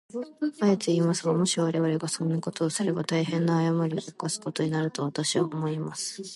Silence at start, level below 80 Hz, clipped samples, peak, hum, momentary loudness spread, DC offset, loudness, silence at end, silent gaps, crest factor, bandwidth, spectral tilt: 0.15 s; -74 dBFS; under 0.1%; -10 dBFS; none; 7 LU; under 0.1%; -27 LUFS; 0 s; none; 18 dB; 11.5 kHz; -5 dB/octave